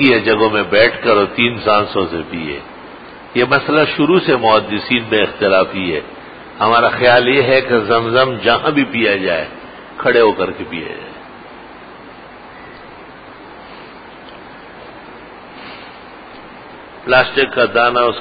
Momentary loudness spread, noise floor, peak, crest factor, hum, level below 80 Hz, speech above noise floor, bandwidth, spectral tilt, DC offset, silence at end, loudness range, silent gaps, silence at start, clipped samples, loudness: 24 LU; -36 dBFS; 0 dBFS; 16 dB; none; -48 dBFS; 22 dB; 5 kHz; -8.5 dB/octave; under 0.1%; 0 s; 22 LU; none; 0 s; under 0.1%; -14 LUFS